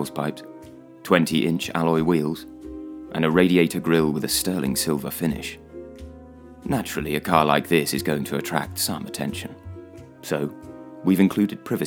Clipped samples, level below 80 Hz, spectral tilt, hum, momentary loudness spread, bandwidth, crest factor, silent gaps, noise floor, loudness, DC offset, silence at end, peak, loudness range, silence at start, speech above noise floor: under 0.1%; -50 dBFS; -5 dB/octave; none; 21 LU; over 20 kHz; 24 dB; none; -44 dBFS; -23 LUFS; under 0.1%; 0 s; 0 dBFS; 4 LU; 0 s; 21 dB